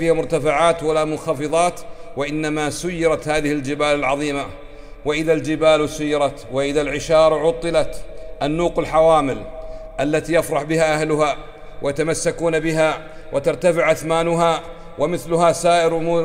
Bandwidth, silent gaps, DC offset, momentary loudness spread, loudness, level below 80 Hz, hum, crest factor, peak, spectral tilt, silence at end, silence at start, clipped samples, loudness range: 16 kHz; none; under 0.1%; 11 LU; -19 LUFS; -38 dBFS; none; 16 dB; -2 dBFS; -5 dB/octave; 0 s; 0 s; under 0.1%; 2 LU